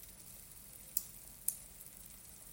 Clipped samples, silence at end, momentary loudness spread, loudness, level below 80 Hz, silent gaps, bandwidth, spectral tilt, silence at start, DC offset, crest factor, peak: under 0.1%; 0 s; 12 LU; -44 LUFS; -66 dBFS; none; 17 kHz; -1 dB/octave; 0 s; under 0.1%; 36 dB; -12 dBFS